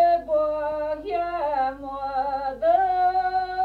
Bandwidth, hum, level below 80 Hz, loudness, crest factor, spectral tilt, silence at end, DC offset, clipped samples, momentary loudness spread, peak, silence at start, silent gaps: 5 kHz; 50 Hz at -50 dBFS; -50 dBFS; -24 LUFS; 14 dB; -6 dB/octave; 0 s; under 0.1%; under 0.1%; 8 LU; -10 dBFS; 0 s; none